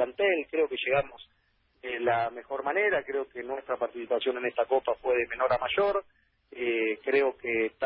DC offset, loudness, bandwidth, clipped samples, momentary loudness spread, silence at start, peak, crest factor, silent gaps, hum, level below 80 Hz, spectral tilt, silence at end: under 0.1%; -29 LUFS; 5.4 kHz; under 0.1%; 8 LU; 0 s; -14 dBFS; 16 dB; none; none; -64 dBFS; -8.5 dB/octave; 0 s